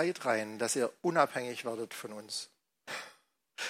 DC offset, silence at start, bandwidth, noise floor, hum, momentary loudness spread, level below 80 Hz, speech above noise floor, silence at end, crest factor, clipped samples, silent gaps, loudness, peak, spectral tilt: under 0.1%; 0 s; 16 kHz; -64 dBFS; none; 19 LU; -88 dBFS; 31 dB; 0 s; 24 dB; under 0.1%; none; -34 LUFS; -12 dBFS; -3 dB/octave